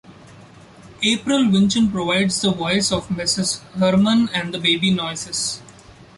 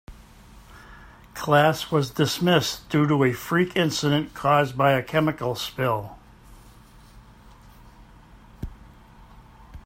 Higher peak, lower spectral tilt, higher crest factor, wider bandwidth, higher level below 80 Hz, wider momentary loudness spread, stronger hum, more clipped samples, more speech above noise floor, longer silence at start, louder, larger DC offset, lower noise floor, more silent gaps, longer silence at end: about the same, -4 dBFS vs -4 dBFS; second, -4 dB/octave vs -5.5 dB/octave; about the same, 16 dB vs 20 dB; second, 11.5 kHz vs 16 kHz; about the same, -50 dBFS vs -50 dBFS; second, 7 LU vs 18 LU; neither; neither; about the same, 26 dB vs 27 dB; about the same, 0.1 s vs 0.1 s; first, -19 LUFS vs -22 LUFS; neither; second, -44 dBFS vs -49 dBFS; neither; first, 0.45 s vs 0.05 s